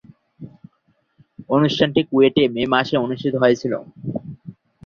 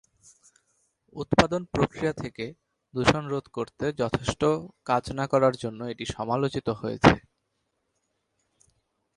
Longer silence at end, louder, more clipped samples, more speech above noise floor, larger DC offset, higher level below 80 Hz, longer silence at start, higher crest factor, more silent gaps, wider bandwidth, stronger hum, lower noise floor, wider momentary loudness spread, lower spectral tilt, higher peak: second, 0.35 s vs 1.95 s; first, -19 LUFS vs -26 LUFS; neither; second, 47 dB vs 51 dB; neither; second, -58 dBFS vs -48 dBFS; second, 0.4 s vs 1.15 s; second, 18 dB vs 28 dB; neither; second, 7.2 kHz vs 11.5 kHz; neither; second, -65 dBFS vs -77 dBFS; about the same, 14 LU vs 14 LU; about the same, -6.5 dB/octave vs -5.5 dB/octave; about the same, -2 dBFS vs 0 dBFS